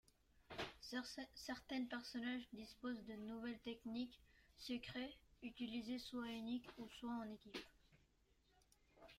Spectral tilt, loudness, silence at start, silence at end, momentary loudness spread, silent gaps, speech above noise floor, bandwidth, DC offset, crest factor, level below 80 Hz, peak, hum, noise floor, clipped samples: -4 dB/octave; -50 LUFS; 0.35 s; 0 s; 9 LU; none; 29 dB; 15.5 kHz; under 0.1%; 16 dB; -74 dBFS; -34 dBFS; none; -78 dBFS; under 0.1%